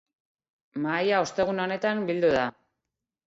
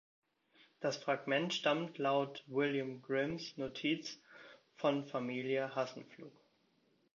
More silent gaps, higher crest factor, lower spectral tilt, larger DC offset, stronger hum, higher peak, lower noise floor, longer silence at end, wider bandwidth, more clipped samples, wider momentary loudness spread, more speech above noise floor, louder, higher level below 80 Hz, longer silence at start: neither; about the same, 16 dB vs 20 dB; first, -5 dB/octave vs -3.5 dB/octave; neither; neither; first, -12 dBFS vs -20 dBFS; first, -86 dBFS vs -75 dBFS; about the same, 0.75 s vs 0.85 s; first, 8 kHz vs 7.2 kHz; neither; second, 9 LU vs 18 LU; first, 61 dB vs 38 dB; first, -26 LUFS vs -37 LUFS; first, -62 dBFS vs -80 dBFS; about the same, 0.75 s vs 0.8 s